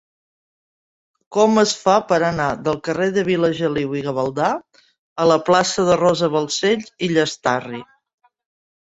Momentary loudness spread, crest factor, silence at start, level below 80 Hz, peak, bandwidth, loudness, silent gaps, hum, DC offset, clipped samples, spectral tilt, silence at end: 7 LU; 18 dB; 1.3 s; -54 dBFS; -2 dBFS; 8 kHz; -18 LUFS; 4.98-5.16 s; none; under 0.1%; under 0.1%; -4.5 dB/octave; 1 s